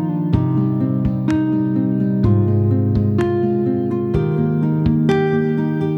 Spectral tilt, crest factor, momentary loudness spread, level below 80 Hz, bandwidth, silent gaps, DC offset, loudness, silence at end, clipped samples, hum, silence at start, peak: -10 dB/octave; 14 dB; 3 LU; -36 dBFS; 7.8 kHz; none; under 0.1%; -18 LUFS; 0 s; under 0.1%; none; 0 s; -2 dBFS